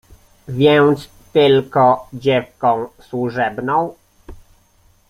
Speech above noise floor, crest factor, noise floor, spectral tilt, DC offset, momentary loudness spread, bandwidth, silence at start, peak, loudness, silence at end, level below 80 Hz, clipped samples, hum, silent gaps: 39 dB; 16 dB; -54 dBFS; -7 dB/octave; under 0.1%; 11 LU; 14.5 kHz; 0.5 s; -2 dBFS; -16 LUFS; 0.75 s; -50 dBFS; under 0.1%; none; none